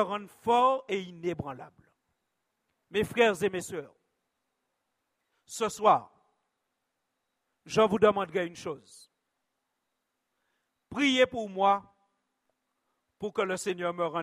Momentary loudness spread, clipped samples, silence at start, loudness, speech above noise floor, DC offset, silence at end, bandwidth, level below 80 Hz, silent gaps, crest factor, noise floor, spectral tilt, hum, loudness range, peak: 16 LU; under 0.1%; 0 s; -28 LUFS; 54 dB; under 0.1%; 0 s; 15.5 kHz; -68 dBFS; none; 22 dB; -82 dBFS; -4.5 dB/octave; none; 4 LU; -8 dBFS